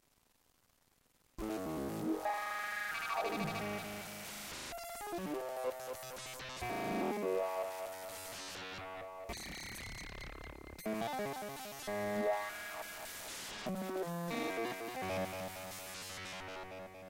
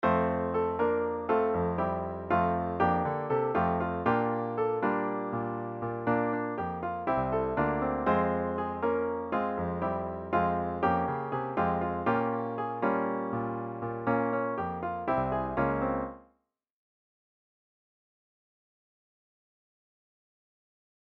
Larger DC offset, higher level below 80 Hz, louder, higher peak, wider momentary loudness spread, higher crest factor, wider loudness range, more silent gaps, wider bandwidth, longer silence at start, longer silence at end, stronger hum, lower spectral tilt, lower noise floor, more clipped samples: neither; second, -62 dBFS vs -54 dBFS; second, -41 LUFS vs -30 LUFS; second, -26 dBFS vs -12 dBFS; first, 9 LU vs 6 LU; about the same, 16 dB vs 20 dB; about the same, 4 LU vs 4 LU; neither; first, 17 kHz vs 5.4 kHz; first, 1.4 s vs 0 s; second, 0 s vs 4.9 s; neither; second, -4 dB/octave vs -10 dB/octave; about the same, -74 dBFS vs -76 dBFS; neither